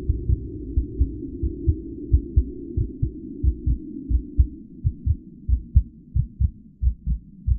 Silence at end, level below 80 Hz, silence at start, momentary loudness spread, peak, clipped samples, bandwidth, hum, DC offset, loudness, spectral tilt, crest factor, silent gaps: 0 s; -24 dBFS; 0 s; 7 LU; -4 dBFS; under 0.1%; 0.6 kHz; none; under 0.1%; -27 LUFS; -19.5 dB/octave; 20 dB; none